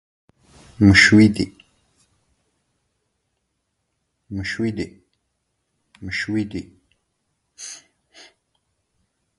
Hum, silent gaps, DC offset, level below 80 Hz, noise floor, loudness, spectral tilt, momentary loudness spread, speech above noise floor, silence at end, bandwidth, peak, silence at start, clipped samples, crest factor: none; none; under 0.1%; -44 dBFS; -74 dBFS; -17 LUFS; -5 dB/octave; 24 LU; 57 dB; 1.65 s; 11.5 kHz; 0 dBFS; 0.8 s; under 0.1%; 24 dB